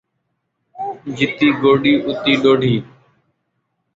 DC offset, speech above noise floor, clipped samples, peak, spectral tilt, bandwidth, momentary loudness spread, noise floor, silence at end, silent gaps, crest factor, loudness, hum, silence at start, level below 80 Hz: under 0.1%; 57 dB; under 0.1%; -2 dBFS; -6.5 dB/octave; 7.6 kHz; 14 LU; -72 dBFS; 1.1 s; none; 16 dB; -15 LUFS; none; 0.75 s; -54 dBFS